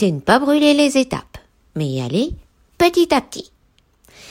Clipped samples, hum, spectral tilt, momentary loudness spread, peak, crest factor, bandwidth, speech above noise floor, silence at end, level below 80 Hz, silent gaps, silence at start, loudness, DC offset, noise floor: under 0.1%; none; -5 dB/octave; 19 LU; -2 dBFS; 16 dB; 16 kHz; 42 dB; 0.9 s; -44 dBFS; none; 0 s; -17 LUFS; under 0.1%; -58 dBFS